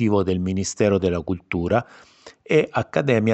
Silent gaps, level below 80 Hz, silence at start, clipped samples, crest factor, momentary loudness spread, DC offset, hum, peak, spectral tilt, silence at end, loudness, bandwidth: none; -48 dBFS; 0 s; under 0.1%; 16 dB; 6 LU; under 0.1%; none; -4 dBFS; -6 dB/octave; 0 s; -22 LUFS; 8.6 kHz